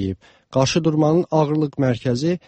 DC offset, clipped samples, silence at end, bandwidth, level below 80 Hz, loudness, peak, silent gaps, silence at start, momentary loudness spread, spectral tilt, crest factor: under 0.1%; under 0.1%; 0.1 s; 8.6 kHz; -50 dBFS; -20 LUFS; -4 dBFS; none; 0 s; 8 LU; -6.5 dB/octave; 14 dB